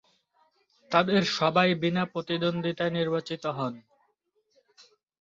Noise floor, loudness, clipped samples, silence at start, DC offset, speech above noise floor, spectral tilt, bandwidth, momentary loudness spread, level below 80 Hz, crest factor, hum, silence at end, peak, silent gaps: -73 dBFS; -27 LUFS; under 0.1%; 0.9 s; under 0.1%; 47 dB; -6 dB/octave; 7.6 kHz; 10 LU; -68 dBFS; 22 dB; none; 1.4 s; -8 dBFS; none